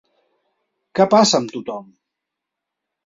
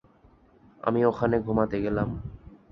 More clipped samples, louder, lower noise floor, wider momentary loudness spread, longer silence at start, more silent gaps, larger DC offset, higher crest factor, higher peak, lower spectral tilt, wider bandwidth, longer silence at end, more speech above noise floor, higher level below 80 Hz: neither; first, -16 LUFS vs -26 LUFS; first, -82 dBFS vs -58 dBFS; first, 18 LU vs 10 LU; about the same, 0.95 s vs 0.85 s; neither; neither; about the same, 20 dB vs 20 dB; first, -2 dBFS vs -8 dBFS; second, -4 dB/octave vs -10 dB/octave; first, 7.8 kHz vs 6.2 kHz; first, 1.2 s vs 0.15 s; first, 65 dB vs 33 dB; second, -64 dBFS vs -46 dBFS